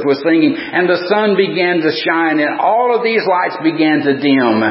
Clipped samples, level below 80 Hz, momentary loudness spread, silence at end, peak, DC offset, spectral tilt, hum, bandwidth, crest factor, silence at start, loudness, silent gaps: under 0.1%; -66 dBFS; 2 LU; 0 s; 0 dBFS; under 0.1%; -10 dB/octave; none; 5.8 kHz; 12 dB; 0 s; -13 LUFS; none